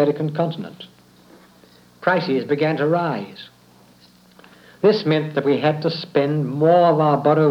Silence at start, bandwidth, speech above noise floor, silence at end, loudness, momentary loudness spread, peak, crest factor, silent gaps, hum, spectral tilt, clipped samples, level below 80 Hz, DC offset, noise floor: 0 s; 7.2 kHz; 33 dB; 0 s; -19 LUFS; 13 LU; -4 dBFS; 16 dB; none; none; -8 dB/octave; under 0.1%; -70 dBFS; under 0.1%; -51 dBFS